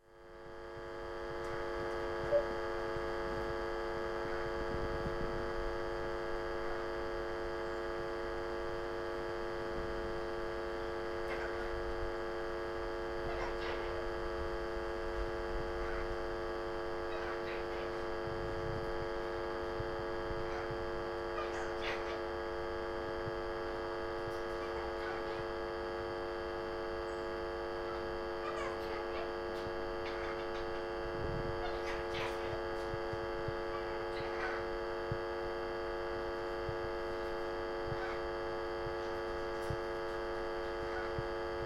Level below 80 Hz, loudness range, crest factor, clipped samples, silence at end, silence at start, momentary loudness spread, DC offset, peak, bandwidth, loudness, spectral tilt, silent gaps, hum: -50 dBFS; 1 LU; 18 dB; under 0.1%; 0 s; 0.05 s; 2 LU; under 0.1%; -22 dBFS; 13.5 kHz; -39 LUFS; -6 dB/octave; none; none